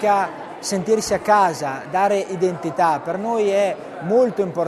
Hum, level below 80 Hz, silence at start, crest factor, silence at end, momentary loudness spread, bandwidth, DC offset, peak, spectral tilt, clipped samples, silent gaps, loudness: none; -58 dBFS; 0 s; 16 dB; 0 s; 8 LU; 13.5 kHz; under 0.1%; -4 dBFS; -4.5 dB/octave; under 0.1%; none; -20 LUFS